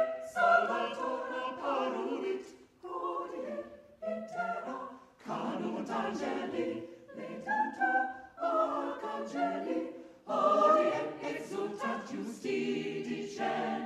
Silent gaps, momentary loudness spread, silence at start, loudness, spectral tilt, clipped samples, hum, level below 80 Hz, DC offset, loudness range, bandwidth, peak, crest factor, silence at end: none; 16 LU; 0 s; -34 LUFS; -5 dB/octave; under 0.1%; none; -76 dBFS; under 0.1%; 7 LU; 13 kHz; -14 dBFS; 20 dB; 0 s